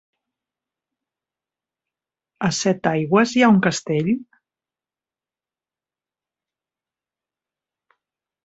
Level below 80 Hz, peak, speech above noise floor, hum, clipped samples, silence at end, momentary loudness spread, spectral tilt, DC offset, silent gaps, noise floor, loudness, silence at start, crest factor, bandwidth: -64 dBFS; -2 dBFS; over 72 dB; none; under 0.1%; 4.2 s; 9 LU; -5 dB/octave; under 0.1%; none; under -90 dBFS; -19 LUFS; 2.4 s; 22 dB; 8.2 kHz